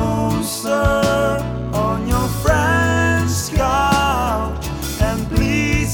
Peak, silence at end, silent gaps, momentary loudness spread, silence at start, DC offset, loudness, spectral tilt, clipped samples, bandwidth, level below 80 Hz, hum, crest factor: -2 dBFS; 0 s; none; 6 LU; 0 s; under 0.1%; -18 LUFS; -5 dB/octave; under 0.1%; 19.5 kHz; -26 dBFS; none; 16 dB